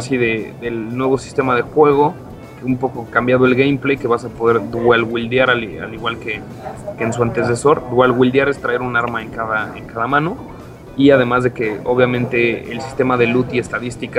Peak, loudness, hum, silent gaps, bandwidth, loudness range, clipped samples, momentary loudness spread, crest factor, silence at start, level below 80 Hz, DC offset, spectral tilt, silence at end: 0 dBFS; -17 LUFS; none; none; 14 kHz; 2 LU; under 0.1%; 13 LU; 16 dB; 0 s; -44 dBFS; under 0.1%; -6.5 dB/octave; 0 s